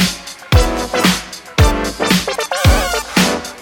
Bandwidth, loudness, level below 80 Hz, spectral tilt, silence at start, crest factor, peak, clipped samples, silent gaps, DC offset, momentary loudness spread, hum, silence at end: 17 kHz; -15 LUFS; -22 dBFS; -4 dB/octave; 0 s; 14 dB; 0 dBFS; under 0.1%; none; under 0.1%; 5 LU; none; 0 s